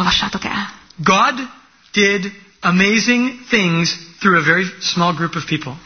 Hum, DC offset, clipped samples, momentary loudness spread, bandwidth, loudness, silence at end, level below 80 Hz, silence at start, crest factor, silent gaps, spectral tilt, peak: none; under 0.1%; under 0.1%; 10 LU; 6.6 kHz; -16 LUFS; 0.05 s; -48 dBFS; 0 s; 16 dB; none; -4 dB/octave; 0 dBFS